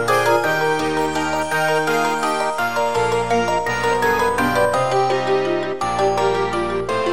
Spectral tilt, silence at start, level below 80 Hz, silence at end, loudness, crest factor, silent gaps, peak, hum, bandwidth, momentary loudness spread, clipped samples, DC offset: -4 dB/octave; 0 s; -44 dBFS; 0 s; -19 LUFS; 14 dB; none; -4 dBFS; none; 16.5 kHz; 4 LU; under 0.1%; 1%